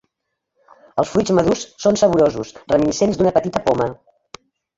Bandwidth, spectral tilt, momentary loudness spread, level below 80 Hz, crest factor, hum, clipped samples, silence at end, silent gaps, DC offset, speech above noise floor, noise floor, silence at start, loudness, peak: 8 kHz; -5.5 dB/octave; 8 LU; -48 dBFS; 16 dB; none; under 0.1%; 0.85 s; none; under 0.1%; 60 dB; -77 dBFS; 0.95 s; -18 LUFS; -2 dBFS